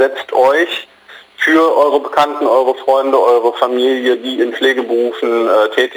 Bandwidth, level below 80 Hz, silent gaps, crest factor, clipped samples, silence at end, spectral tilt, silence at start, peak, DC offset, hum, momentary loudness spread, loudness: over 20 kHz; -68 dBFS; none; 12 dB; under 0.1%; 0 s; -3 dB/octave; 0 s; 0 dBFS; under 0.1%; none; 5 LU; -13 LUFS